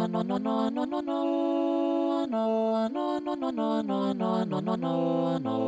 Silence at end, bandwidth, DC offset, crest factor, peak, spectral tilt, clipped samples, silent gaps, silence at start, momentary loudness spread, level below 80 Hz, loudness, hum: 0 s; 8 kHz; under 0.1%; 12 dB; -14 dBFS; -8 dB/octave; under 0.1%; none; 0 s; 3 LU; -74 dBFS; -28 LUFS; none